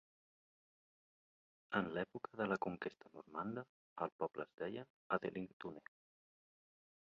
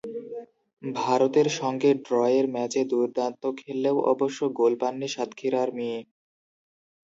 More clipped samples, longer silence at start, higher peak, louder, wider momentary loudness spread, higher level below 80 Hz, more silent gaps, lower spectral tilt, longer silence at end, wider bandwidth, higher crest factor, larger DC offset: neither; first, 1.7 s vs 0.05 s; second, -22 dBFS vs -8 dBFS; second, -45 LUFS vs -25 LUFS; about the same, 12 LU vs 12 LU; about the same, -80 dBFS vs -78 dBFS; first, 3.69-3.96 s, 4.12-4.19 s, 4.54-4.58 s, 4.90-5.10 s, 5.53-5.60 s vs 0.73-0.77 s; about the same, -4.5 dB/octave vs -5 dB/octave; first, 1.4 s vs 1 s; second, 7 kHz vs 8 kHz; first, 24 dB vs 18 dB; neither